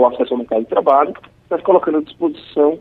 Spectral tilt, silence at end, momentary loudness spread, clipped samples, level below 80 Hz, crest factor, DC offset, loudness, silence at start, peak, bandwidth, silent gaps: -8.5 dB/octave; 0 s; 8 LU; under 0.1%; -58 dBFS; 14 dB; under 0.1%; -17 LUFS; 0 s; -2 dBFS; 4.5 kHz; none